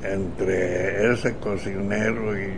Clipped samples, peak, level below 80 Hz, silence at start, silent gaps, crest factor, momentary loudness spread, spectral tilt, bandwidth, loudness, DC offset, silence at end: under 0.1%; -6 dBFS; -42 dBFS; 0 s; none; 18 dB; 6 LU; -6.5 dB/octave; 10 kHz; -24 LUFS; 2%; 0 s